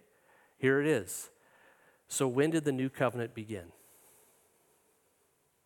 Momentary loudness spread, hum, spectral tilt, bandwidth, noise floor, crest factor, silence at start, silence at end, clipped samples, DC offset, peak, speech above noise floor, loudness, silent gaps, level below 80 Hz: 14 LU; none; -5 dB/octave; 17.5 kHz; -73 dBFS; 22 dB; 0.6 s; 1.95 s; under 0.1%; under 0.1%; -14 dBFS; 42 dB; -32 LUFS; none; -76 dBFS